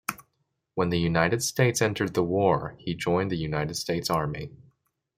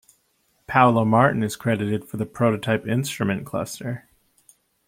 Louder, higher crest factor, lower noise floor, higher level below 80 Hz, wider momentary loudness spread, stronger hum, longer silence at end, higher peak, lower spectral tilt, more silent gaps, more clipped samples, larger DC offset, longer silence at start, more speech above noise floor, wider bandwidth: second, -26 LUFS vs -22 LUFS; about the same, 22 dB vs 22 dB; first, -76 dBFS vs -67 dBFS; first, -54 dBFS vs -60 dBFS; second, 10 LU vs 13 LU; neither; second, 0.65 s vs 0.9 s; second, -6 dBFS vs -2 dBFS; about the same, -5 dB/octave vs -6 dB/octave; neither; neither; neither; second, 0.1 s vs 0.7 s; first, 50 dB vs 45 dB; about the same, 16.5 kHz vs 16.5 kHz